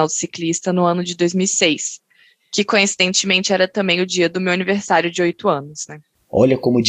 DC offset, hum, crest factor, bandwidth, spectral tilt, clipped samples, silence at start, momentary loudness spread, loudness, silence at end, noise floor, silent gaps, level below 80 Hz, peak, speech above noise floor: under 0.1%; none; 16 dB; 10 kHz; -3.5 dB/octave; under 0.1%; 0 s; 9 LU; -17 LUFS; 0 s; -55 dBFS; none; -56 dBFS; -2 dBFS; 38 dB